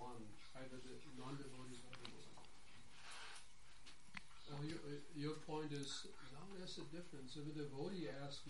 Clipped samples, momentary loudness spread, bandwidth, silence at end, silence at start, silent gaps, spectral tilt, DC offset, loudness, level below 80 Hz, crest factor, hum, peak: under 0.1%; 14 LU; 11.5 kHz; 0 s; 0 s; none; -5 dB/octave; 0.2%; -53 LUFS; -72 dBFS; 20 dB; none; -34 dBFS